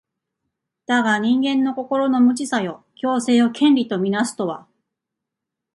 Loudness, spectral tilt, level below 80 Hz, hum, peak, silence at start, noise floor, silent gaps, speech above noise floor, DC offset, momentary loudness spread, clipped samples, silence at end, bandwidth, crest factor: -19 LUFS; -4.5 dB/octave; -68 dBFS; none; -6 dBFS; 0.9 s; -83 dBFS; none; 65 dB; under 0.1%; 11 LU; under 0.1%; 1.15 s; 11.5 kHz; 14 dB